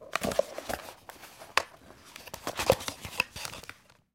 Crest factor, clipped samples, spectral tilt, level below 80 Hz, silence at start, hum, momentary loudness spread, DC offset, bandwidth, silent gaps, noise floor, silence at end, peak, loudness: 32 dB; under 0.1%; -3 dB/octave; -56 dBFS; 0 s; none; 20 LU; under 0.1%; 17 kHz; none; -53 dBFS; 0.4 s; -4 dBFS; -32 LUFS